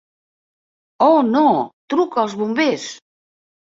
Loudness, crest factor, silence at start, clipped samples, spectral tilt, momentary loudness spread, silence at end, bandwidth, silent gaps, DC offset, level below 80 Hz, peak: -17 LUFS; 16 dB; 1 s; under 0.1%; -5 dB/octave; 8 LU; 0.65 s; 7.8 kHz; 1.73-1.88 s; under 0.1%; -66 dBFS; -2 dBFS